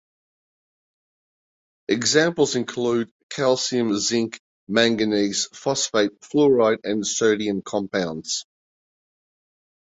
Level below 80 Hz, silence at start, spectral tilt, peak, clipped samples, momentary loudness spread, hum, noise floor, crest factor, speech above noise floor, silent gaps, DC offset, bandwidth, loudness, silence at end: -64 dBFS; 1.9 s; -3.5 dB/octave; -2 dBFS; under 0.1%; 8 LU; none; under -90 dBFS; 20 dB; over 69 dB; 3.11-3.29 s, 4.39-4.67 s; under 0.1%; 8.2 kHz; -22 LUFS; 1.4 s